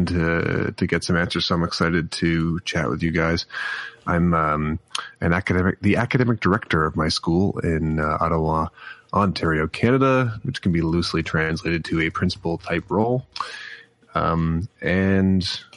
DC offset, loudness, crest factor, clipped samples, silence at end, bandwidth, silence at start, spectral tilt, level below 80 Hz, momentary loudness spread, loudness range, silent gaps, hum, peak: under 0.1%; -22 LUFS; 16 dB; under 0.1%; 0 s; 11.5 kHz; 0 s; -6 dB/octave; -40 dBFS; 7 LU; 3 LU; none; none; -6 dBFS